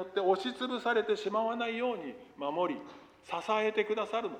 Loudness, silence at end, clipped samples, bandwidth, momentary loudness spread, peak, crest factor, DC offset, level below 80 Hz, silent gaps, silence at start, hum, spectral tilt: -33 LUFS; 0 s; under 0.1%; 10 kHz; 10 LU; -14 dBFS; 18 dB; under 0.1%; -76 dBFS; none; 0 s; none; -4.5 dB/octave